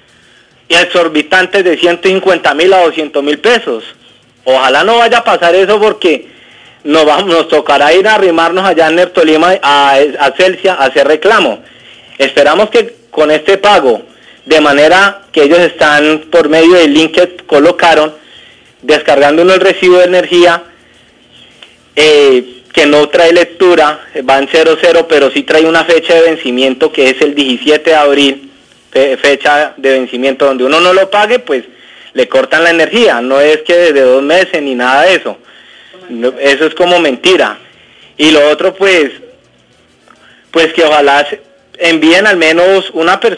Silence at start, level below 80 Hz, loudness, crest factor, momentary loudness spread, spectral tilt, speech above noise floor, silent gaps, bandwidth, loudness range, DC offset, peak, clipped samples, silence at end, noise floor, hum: 0.7 s; -48 dBFS; -7 LUFS; 8 dB; 6 LU; -3.5 dB/octave; 39 dB; none; 10.5 kHz; 3 LU; under 0.1%; 0 dBFS; under 0.1%; 0 s; -46 dBFS; none